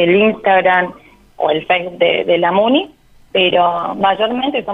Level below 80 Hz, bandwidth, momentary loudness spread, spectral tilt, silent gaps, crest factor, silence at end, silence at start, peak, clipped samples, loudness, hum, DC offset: -52 dBFS; 4.9 kHz; 6 LU; -7 dB/octave; none; 12 dB; 0 s; 0 s; -2 dBFS; under 0.1%; -14 LUFS; none; under 0.1%